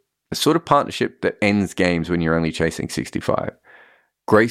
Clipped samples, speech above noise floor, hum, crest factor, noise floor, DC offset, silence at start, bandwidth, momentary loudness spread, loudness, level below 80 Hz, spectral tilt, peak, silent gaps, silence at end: under 0.1%; 34 dB; none; 18 dB; -54 dBFS; under 0.1%; 0.3 s; 15.5 kHz; 8 LU; -20 LUFS; -46 dBFS; -5.5 dB/octave; -2 dBFS; none; 0 s